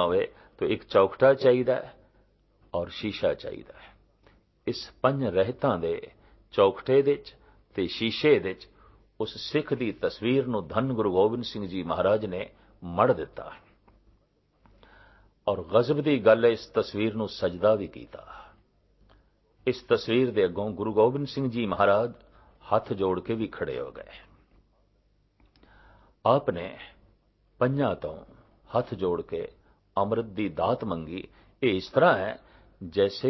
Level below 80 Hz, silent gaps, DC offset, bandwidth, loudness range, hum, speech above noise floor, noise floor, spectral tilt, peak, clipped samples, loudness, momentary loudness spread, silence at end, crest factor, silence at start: -56 dBFS; none; under 0.1%; 6 kHz; 7 LU; 50 Hz at -65 dBFS; 41 dB; -67 dBFS; -7.5 dB/octave; -6 dBFS; under 0.1%; -27 LUFS; 16 LU; 0 s; 22 dB; 0 s